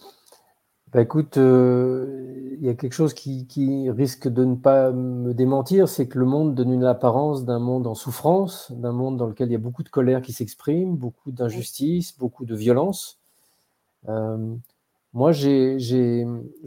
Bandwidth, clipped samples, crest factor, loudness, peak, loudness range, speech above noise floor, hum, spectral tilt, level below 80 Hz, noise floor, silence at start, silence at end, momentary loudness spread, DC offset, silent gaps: 16.5 kHz; under 0.1%; 18 dB; -22 LUFS; -4 dBFS; 6 LU; 48 dB; none; -7.5 dB/octave; -66 dBFS; -69 dBFS; 0.05 s; 0 s; 13 LU; under 0.1%; none